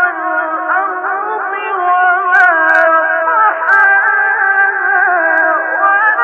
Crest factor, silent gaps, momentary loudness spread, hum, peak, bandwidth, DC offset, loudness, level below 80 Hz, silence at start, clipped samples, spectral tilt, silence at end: 10 dB; none; 9 LU; none; 0 dBFS; 7.2 kHz; under 0.1%; -11 LUFS; -76 dBFS; 0 s; under 0.1%; -2.5 dB/octave; 0 s